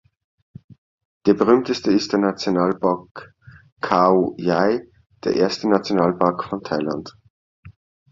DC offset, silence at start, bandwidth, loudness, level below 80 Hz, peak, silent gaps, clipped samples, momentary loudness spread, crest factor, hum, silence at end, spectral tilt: under 0.1%; 1.25 s; 7.6 kHz; -20 LUFS; -58 dBFS; -2 dBFS; 3.11-3.15 s, 3.72-3.76 s, 7.30-7.63 s; under 0.1%; 12 LU; 20 dB; none; 0.4 s; -6.5 dB/octave